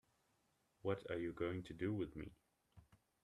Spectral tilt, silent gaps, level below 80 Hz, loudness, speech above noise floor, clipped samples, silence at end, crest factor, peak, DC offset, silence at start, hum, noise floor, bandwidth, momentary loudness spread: -8 dB/octave; none; -70 dBFS; -45 LUFS; 37 dB; under 0.1%; 0.4 s; 20 dB; -26 dBFS; under 0.1%; 0.85 s; none; -81 dBFS; 13 kHz; 7 LU